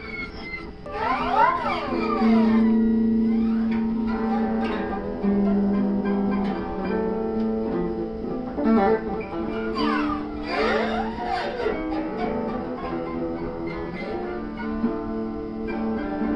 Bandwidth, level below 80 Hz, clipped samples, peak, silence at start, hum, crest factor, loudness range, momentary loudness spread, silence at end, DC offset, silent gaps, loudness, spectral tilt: 6 kHz; -42 dBFS; under 0.1%; -8 dBFS; 0 s; none; 16 dB; 7 LU; 10 LU; 0 s; under 0.1%; none; -25 LUFS; -8 dB/octave